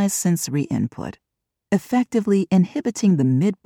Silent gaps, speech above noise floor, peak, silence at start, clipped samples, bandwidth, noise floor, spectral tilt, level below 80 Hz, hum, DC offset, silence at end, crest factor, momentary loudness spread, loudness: none; 51 dB; -6 dBFS; 0 s; under 0.1%; 16.5 kHz; -71 dBFS; -6 dB/octave; -60 dBFS; none; under 0.1%; 0.1 s; 14 dB; 7 LU; -20 LUFS